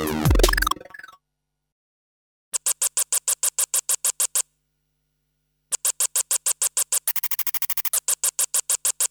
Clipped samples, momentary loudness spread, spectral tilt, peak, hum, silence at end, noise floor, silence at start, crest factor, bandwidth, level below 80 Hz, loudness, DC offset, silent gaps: under 0.1%; 4 LU; -2 dB/octave; 0 dBFS; none; 0.05 s; -80 dBFS; 0 s; 24 dB; over 20 kHz; -34 dBFS; -21 LUFS; under 0.1%; 1.72-2.52 s